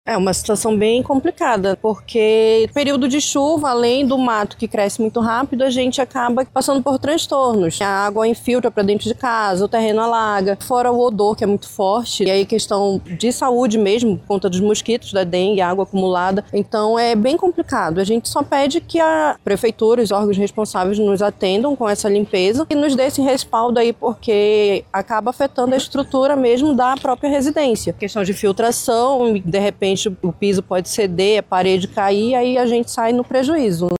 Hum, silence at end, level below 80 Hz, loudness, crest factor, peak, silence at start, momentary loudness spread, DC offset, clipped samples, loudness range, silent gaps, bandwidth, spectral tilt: none; 0 s; -48 dBFS; -17 LUFS; 12 dB; -4 dBFS; 0.05 s; 4 LU; under 0.1%; under 0.1%; 1 LU; none; 16.5 kHz; -4.5 dB/octave